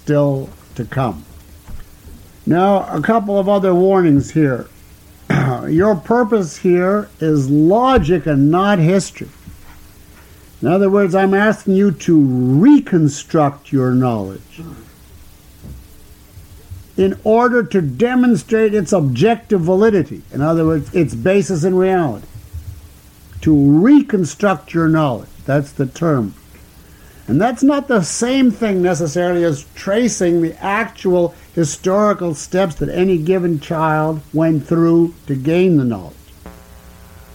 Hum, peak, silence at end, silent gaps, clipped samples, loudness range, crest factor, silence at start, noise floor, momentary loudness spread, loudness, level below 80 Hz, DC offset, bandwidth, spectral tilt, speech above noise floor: none; -2 dBFS; 0.85 s; none; under 0.1%; 5 LU; 12 dB; 0.05 s; -42 dBFS; 10 LU; -15 LUFS; -40 dBFS; under 0.1%; 16.5 kHz; -7 dB/octave; 28 dB